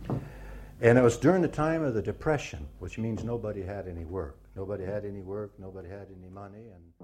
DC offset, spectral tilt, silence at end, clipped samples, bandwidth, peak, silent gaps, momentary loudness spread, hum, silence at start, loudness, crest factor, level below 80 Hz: under 0.1%; -7 dB/octave; 0 s; under 0.1%; 13.5 kHz; -8 dBFS; none; 23 LU; none; 0 s; -29 LUFS; 22 dB; -48 dBFS